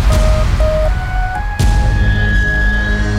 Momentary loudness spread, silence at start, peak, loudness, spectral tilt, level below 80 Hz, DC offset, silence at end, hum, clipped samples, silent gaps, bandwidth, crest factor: 5 LU; 0 s; -2 dBFS; -15 LUFS; -6 dB/octave; -14 dBFS; under 0.1%; 0 s; none; under 0.1%; none; 13 kHz; 10 dB